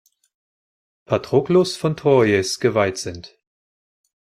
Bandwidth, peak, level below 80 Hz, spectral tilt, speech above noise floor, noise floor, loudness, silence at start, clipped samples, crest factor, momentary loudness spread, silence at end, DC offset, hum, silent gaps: 14.5 kHz; -2 dBFS; -58 dBFS; -5.5 dB/octave; over 72 dB; under -90 dBFS; -19 LUFS; 1.1 s; under 0.1%; 18 dB; 12 LU; 1.05 s; under 0.1%; none; none